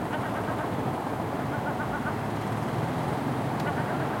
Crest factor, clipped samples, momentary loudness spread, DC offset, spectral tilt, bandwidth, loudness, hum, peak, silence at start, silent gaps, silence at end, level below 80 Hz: 12 dB; under 0.1%; 2 LU; under 0.1%; -6.5 dB/octave; 16.5 kHz; -30 LUFS; none; -16 dBFS; 0 s; none; 0 s; -54 dBFS